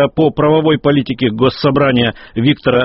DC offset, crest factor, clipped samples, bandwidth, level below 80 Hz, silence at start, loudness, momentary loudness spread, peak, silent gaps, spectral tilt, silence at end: under 0.1%; 12 dB; under 0.1%; 5.8 kHz; -42 dBFS; 0 s; -13 LUFS; 4 LU; -2 dBFS; none; -5 dB/octave; 0 s